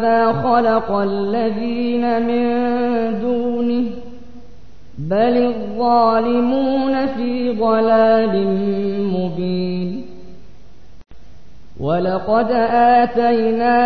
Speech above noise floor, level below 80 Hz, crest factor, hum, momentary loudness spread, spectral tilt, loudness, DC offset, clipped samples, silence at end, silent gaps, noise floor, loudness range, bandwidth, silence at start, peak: 30 dB; -46 dBFS; 14 dB; none; 8 LU; -9 dB/octave; -17 LUFS; 3%; under 0.1%; 0 s; none; -46 dBFS; 7 LU; 5.8 kHz; 0 s; -4 dBFS